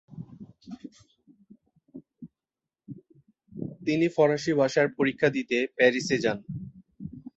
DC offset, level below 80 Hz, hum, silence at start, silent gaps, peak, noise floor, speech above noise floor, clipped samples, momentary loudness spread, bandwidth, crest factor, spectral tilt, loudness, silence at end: under 0.1%; -64 dBFS; none; 0.1 s; none; -8 dBFS; under -90 dBFS; over 66 dB; under 0.1%; 24 LU; 8.2 kHz; 22 dB; -5.5 dB/octave; -25 LUFS; 0.15 s